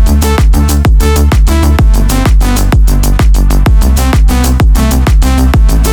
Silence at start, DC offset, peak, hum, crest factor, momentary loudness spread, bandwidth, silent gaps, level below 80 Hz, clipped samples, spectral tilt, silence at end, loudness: 0 s; under 0.1%; 0 dBFS; none; 6 dB; 1 LU; 19 kHz; none; -6 dBFS; under 0.1%; -5.5 dB/octave; 0 s; -9 LUFS